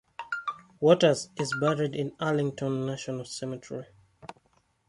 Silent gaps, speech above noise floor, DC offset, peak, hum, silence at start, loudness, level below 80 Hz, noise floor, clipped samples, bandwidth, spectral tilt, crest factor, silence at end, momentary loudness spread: none; 41 dB; under 0.1%; -6 dBFS; none; 0.2 s; -28 LUFS; -68 dBFS; -69 dBFS; under 0.1%; 11.5 kHz; -5.5 dB/octave; 24 dB; 0.55 s; 19 LU